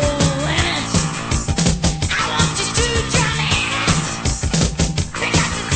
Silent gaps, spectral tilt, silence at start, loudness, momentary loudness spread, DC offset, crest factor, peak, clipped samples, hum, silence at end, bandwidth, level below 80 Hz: none; -3.5 dB/octave; 0 s; -18 LUFS; 4 LU; under 0.1%; 16 dB; -2 dBFS; under 0.1%; none; 0 s; 9.2 kHz; -28 dBFS